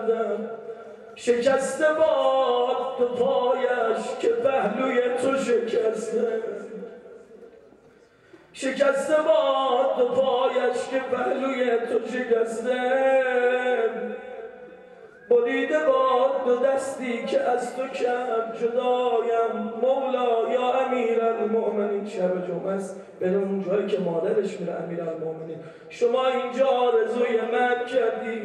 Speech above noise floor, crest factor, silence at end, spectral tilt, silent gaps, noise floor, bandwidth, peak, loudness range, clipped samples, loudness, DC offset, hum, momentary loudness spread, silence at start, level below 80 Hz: 31 dB; 16 dB; 0 s; -5 dB/octave; none; -55 dBFS; 11.5 kHz; -8 dBFS; 4 LU; under 0.1%; -24 LUFS; under 0.1%; none; 10 LU; 0 s; -74 dBFS